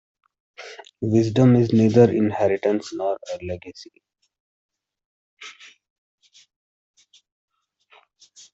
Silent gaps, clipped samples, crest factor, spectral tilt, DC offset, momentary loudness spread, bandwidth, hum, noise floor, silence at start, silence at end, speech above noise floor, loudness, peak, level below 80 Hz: 4.40-4.69 s, 5.05-5.37 s; under 0.1%; 20 dB; -8 dB/octave; under 0.1%; 25 LU; 8 kHz; none; -58 dBFS; 0.6 s; 3.05 s; 39 dB; -20 LUFS; -4 dBFS; -62 dBFS